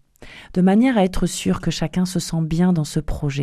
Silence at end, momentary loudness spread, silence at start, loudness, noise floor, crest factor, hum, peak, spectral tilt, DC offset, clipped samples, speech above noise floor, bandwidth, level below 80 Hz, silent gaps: 0 s; 9 LU; 0.2 s; -20 LUFS; -42 dBFS; 16 dB; none; -4 dBFS; -6 dB/octave; under 0.1%; under 0.1%; 24 dB; 14.5 kHz; -34 dBFS; none